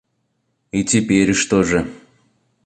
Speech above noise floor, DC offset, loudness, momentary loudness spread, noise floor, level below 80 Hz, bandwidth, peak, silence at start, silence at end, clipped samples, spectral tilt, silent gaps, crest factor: 53 dB; under 0.1%; -17 LUFS; 9 LU; -69 dBFS; -44 dBFS; 10 kHz; -2 dBFS; 0.75 s; 0.7 s; under 0.1%; -4.5 dB/octave; none; 18 dB